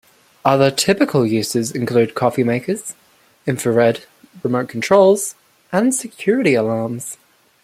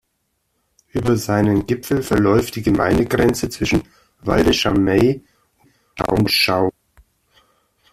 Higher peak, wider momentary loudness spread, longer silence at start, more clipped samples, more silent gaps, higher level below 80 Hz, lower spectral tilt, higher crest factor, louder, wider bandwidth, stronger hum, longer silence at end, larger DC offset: about the same, -2 dBFS vs 0 dBFS; first, 12 LU vs 8 LU; second, 0.45 s vs 0.95 s; neither; neither; second, -60 dBFS vs -38 dBFS; about the same, -5 dB/octave vs -5.5 dB/octave; about the same, 16 dB vs 18 dB; about the same, -17 LUFS vs -18 LUFS; about the same, 16 kHz vs 15.5 kHz; neither; second, 0.5 s vs 1.2 s; neither